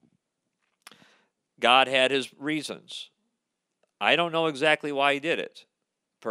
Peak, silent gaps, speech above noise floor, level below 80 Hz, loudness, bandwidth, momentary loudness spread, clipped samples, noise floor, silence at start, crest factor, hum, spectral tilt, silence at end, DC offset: -4 dBFS; none; 57 dB; -86 dBFS; -24 LUFS; 14 kHz; 19 LU; under 0.1%; -82 dBFS; 1.6 s; 24 dB; none; -3.5 dB/octave; 0 s; under 0.1%